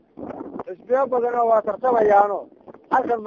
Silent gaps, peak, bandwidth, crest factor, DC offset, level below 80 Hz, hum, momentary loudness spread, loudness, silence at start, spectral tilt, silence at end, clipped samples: none; -2 dBFS; 7.2 kHz; 20 dB; under 0.1%; -60 dBFS; none; 18 LU; -20 LUFS; 0.2 s; -7.5 dB/octave; 0 s; under 0.1%